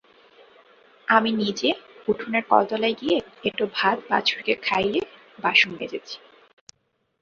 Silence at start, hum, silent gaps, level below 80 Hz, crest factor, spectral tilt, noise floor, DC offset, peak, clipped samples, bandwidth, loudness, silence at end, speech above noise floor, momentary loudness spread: 1.1 s; none; none; -64 dBFS; 22 dB; -4 dB/octave; -72 dBFS; under 0.1%; -2 dBFS; under 0.1%; 7.6 kHz; -23 LUFS; 1.05 s; 49 dB; 13 LU